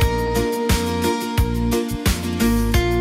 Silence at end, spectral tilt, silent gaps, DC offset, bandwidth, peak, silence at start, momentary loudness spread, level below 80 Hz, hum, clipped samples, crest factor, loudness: 0 s; -5.5 dB/octave; none; under 0.1%; 16 kHz; -4 dBFS; 0 s; 3 LU; -26 dBFS; none; under 0.1%; 14 dB; -20 LUFS